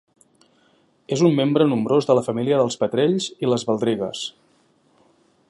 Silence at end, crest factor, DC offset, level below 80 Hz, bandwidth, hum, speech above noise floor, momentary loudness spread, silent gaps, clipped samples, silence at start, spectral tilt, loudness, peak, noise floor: 1.2 s; 18 dB; under 0.1%; -66 dBFS; 11.5 kHz; none; 41 dB; 9 LU; none; under 0.1%; 1.1 s; -6 dB/octave; -20 LUFS; -4 dBFS; -60 dBFS